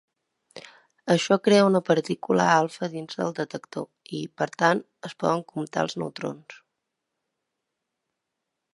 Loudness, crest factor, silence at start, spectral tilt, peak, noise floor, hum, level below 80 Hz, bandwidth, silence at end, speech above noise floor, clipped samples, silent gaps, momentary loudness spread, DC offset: -25 LUFS; 22 dB; 0.55 s; -5.5 dB/octave; -4 dBFS; -83 dBFS; none; -74 dBFS; 11.5 kHz; 2.2 s; 58 dB; under 0.1%; none; 17 LU; under 0.1%